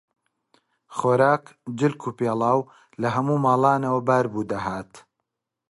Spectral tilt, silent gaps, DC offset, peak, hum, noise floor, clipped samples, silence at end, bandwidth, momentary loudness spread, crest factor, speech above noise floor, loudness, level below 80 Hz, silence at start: -7.5 dB/octave; none; under 0.1%; -4 dBFS; none; -81 dBFS; under 0.1%; 0.7 s; 11.5 kHz; 12 LU; 18 dB; 59 dB; -23 LUFS; -62 dBFS; 0.9 s